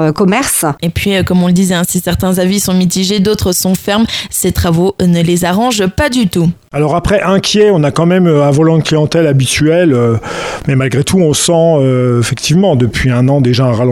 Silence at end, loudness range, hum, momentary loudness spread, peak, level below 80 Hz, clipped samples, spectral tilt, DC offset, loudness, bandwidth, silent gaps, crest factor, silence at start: 0 s; 2 LU; none; 5 LU; 0 dBFS; -32 dBFS; under 0.1%; -5 dB/octave; under 0.1%; -11 LUFS; 19 kHz; none; 10 dB; 0 s